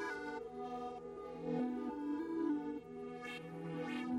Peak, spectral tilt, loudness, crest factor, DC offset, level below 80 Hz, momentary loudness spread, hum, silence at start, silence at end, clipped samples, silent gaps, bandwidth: -28 dBFS; -6.5 dB/octave; -43 LUFS; 14 dB; under 0.1%; -72 dBFS; 8 LU; none; 0 s; 0 s; under 0.1%; none; 11.5 kHz